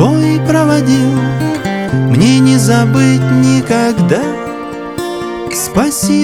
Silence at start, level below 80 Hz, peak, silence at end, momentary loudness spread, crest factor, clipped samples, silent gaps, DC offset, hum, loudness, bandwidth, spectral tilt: 0 s; -40 dBFS; 0 dBFS; 0 s; 11 LU; 10 dB; under 0.1%; none; 0.4%; none; -11 LUFS; 15 kHz; -6 dB/octave